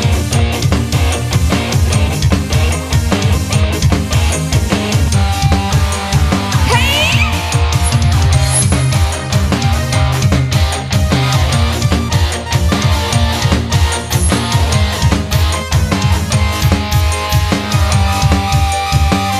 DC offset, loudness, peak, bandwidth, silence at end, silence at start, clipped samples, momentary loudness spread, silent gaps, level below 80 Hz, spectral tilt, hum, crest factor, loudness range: under 0.1%; -13 LUFS; 0 dBFS; 15.5 kHz; 0 s; 0 s; under 0.1%; 3 LU; none; -18 dBFS; -4.5 dB/octave; none; 12 dB; 2 LU